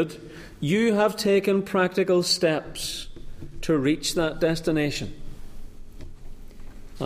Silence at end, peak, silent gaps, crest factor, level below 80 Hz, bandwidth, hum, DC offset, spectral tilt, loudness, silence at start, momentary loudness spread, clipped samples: 0 s; -8 dBFS; none; 16 dB; -42 dBFS; 15.5 kHz; none; under 0.1%; -4.5 dB/octave; -24 LUFS; 0 s; 20 LU; under 0.1%